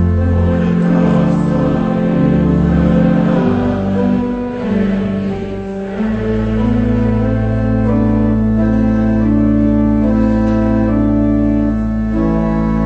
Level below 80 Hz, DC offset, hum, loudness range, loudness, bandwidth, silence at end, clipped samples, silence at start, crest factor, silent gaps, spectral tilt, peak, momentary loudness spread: -24 dBFS; under 0.1%; none; 4 LU; -14 LUFS; 7 kHz; 0 s; under 0.1%; 0 s; 12 dB; none; -10 dB/octave; 0 dBFS; 5 LU